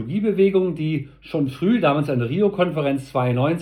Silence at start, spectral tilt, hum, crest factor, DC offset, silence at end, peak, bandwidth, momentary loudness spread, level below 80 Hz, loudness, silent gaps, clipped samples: 0 s; -8.5 dB/octave; none; 16 dB; under 0.1%; 0 s; -6 dBFS; 12 kHz; 7 LU; -54 dBFS; -21 LUFS; none; under 0.1%